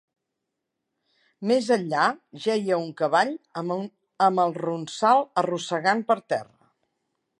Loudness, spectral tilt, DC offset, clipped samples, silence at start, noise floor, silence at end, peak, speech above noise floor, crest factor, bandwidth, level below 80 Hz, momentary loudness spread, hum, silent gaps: -24 LUFS; -5 dB/octave; under 0.1%; under 0.1%; 1.4 s; -82 dBFS; 0.95 s; -6 dBFS; 58 dB; 20 dB; 11 kHz; -80 dBFS; 9 LU; none; none